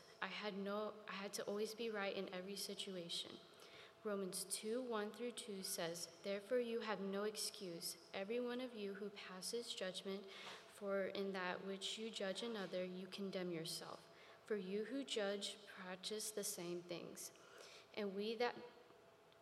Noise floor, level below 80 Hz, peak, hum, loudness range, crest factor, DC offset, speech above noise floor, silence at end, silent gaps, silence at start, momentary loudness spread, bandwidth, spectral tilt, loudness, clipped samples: -67 dBFS; under -90 dBFS; -26 dBFS; none; 2 LU; 22 dB; under 0.1%; 21 dB; 0 s; none; 0 s; 10 LU; 15.5 kHz; -3 dB/octave; -46 LUFS; under 0.1%